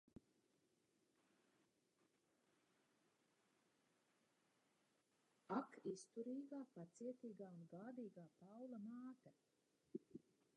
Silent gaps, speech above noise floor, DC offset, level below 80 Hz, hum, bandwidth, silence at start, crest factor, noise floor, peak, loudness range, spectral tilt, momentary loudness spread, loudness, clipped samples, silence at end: none; 28 dB; under 0.1%; under -90 dBFS; none; 11 kHz; 0.15 s; 24 dB; -84 dBFS; -34 dBFS; 5 LU; -6.5 dB/octave; 13 LU; -55 LUFS; under 0.1%; 0.35 s